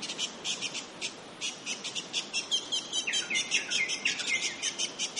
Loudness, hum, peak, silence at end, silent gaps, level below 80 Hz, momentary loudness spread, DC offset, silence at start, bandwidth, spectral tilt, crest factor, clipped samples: -31 LUFS; none; -14 dBFS; 0 s; none; -78 dBFS; 8 LU; under 0.1%; 0 s; 11.5 kHz; 1 dB/octave; 20 dB; under 0.1%